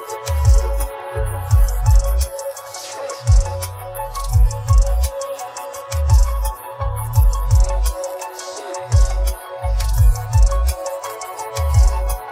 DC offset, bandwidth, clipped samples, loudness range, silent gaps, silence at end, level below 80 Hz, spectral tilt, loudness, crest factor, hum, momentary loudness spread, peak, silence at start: under 0.1%; 16.5 kHz; under 0.1%; 1 LU; none; 0 s; -18 dBFS; -5 dB/octave; -20 LUFS; 14 dB; none; 12 LU; -4 dBFS; 0 s